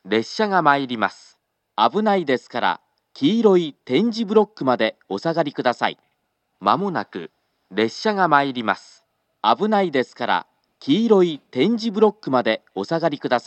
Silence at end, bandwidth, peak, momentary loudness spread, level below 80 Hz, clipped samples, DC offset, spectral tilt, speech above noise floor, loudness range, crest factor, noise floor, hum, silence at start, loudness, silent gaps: 0.05 s; 8.4 kHz; 0 dBFS; 8 LU; -80 dBFS; under 0.1%; under 0.1%; -6 dB/octave; 52 dB; 3 LU; 20 dB; -72 dBFS; none; 0.05 s; -20 LUFS; none